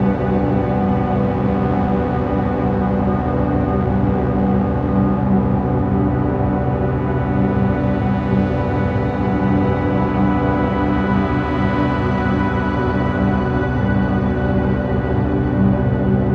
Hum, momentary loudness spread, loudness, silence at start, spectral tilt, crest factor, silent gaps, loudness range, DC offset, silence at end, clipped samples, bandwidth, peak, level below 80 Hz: none; 2 LU; -18 LUFS; 0 s; -10 dB/octave; 14 dB; none; 1 LU; under 0.1%; 0 s; under 0.1%; 5.2 kHz; -4 dBFS; -28 dBFS